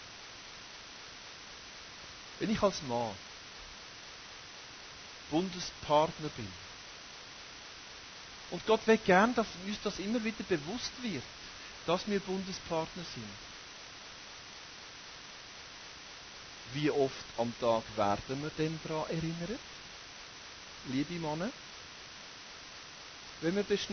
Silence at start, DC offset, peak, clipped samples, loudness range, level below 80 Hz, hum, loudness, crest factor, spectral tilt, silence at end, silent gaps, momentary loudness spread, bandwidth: 0 s; under 0.1%; -12 dBFS; under 0.1%; 9 LU; -62 dBFS; none; -35 LUFS; 24 dB; -4.5 dB/octave; 0 s; none; 16 LU; 6.6 kHz